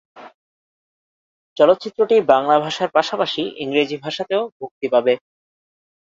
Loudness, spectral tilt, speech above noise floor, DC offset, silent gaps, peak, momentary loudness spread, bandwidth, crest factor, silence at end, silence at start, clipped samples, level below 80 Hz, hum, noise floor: -18 LUFS; -5 dB/octave; over 72 dB; under 0.1%; 0.34-1.56 s, 4.52-4.60 s, 4.71-4.81 s; 0 dBFS; 10 LU; 7.6 kHz; 20 dB; 0.95 s; 0.15 s; under 0.1%; -64 dBFS; none; under -90 dBFS